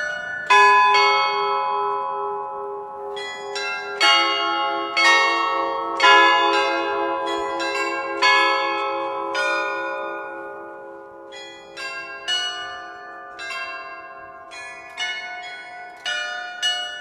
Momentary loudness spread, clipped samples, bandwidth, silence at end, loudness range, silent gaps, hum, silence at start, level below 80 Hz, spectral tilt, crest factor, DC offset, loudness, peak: 22 LU; under 0.1%; 12.5 kHz; 0 s; 13 LU; none; none; 0 s; -68 dBFS; -0.5 dB/octave; 20 dB; under 0.1%; -20 LUFS; -2 dBFS